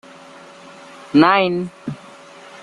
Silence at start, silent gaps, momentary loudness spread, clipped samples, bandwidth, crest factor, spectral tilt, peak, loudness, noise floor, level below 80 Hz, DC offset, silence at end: 1.15 s; none; 27 LU; under 0.1%; 11 kHz; 20 dB; -6.5 dB/octave; -2 dBFS; -16 LUFS; -41 dBFS; -60 dBFS; under 0.1%; 0.65 s